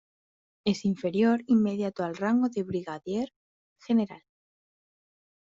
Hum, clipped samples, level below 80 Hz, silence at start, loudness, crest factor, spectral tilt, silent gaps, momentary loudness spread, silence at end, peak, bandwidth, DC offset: none; under 0.1%; -68 dBFS; 0.65 s; -28 LUFS; 16 dB; -6 dB/octave; 3.36-3.76 s; 9 LU; 1.35 s; -12 dBFS; 7.6 kHz; under 0.1%